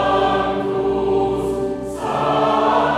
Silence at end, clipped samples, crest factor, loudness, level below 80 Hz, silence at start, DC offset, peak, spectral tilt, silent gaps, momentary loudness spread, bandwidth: 0 s; under 0.1%; 14 dB; -19 LUFS; -40 dBFS; 0 s; under 0.1%; -4 dBFS; -6 dB/octave; none; 7 LU; 12.5 kHz